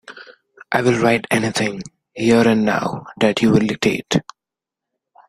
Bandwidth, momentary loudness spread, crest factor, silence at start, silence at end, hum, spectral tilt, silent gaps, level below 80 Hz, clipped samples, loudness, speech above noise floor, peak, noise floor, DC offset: 14.5 kHz; 10 LU; 18 dB; 0.1 s; 1.1 s; none; -5.5 dB/octave; none; -54 dBFS; under 0.1%; -18 LUFS; 70 dB; 0 dBFS; -86 dBFS; under 0.1%